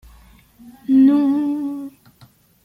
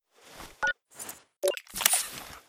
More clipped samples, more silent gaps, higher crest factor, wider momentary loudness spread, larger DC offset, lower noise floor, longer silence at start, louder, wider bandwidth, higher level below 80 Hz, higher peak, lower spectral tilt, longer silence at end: neither; neither; second, 14 dB vs 30 dB; about the same, 20 LU vs 18 LU; neither; about the same, -51 dBFS vs -49 dBFS; first, 0.65 s vs 0.25 s; first, -17 LUFS vs -28 LUFS; second, 4.9 kHz vs over 20 kHz; first, -54 dBFS vs -62 dBFS; second, -6 dBFS vs -2 dBFS; first, -7.5 dB/octave vs 0.5 dB/octave; first, 0.75 s vs 0.1 s